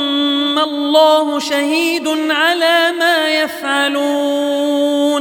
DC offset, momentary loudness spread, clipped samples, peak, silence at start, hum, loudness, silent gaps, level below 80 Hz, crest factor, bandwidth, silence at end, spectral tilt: under 0.1%; 5 LU; under 0.1%; 0 dBFS; 0 s; none; -14 LUFS; none; -68 dBFS; 14 dB; 18.5 kHz; 0 s; -1 dB/octave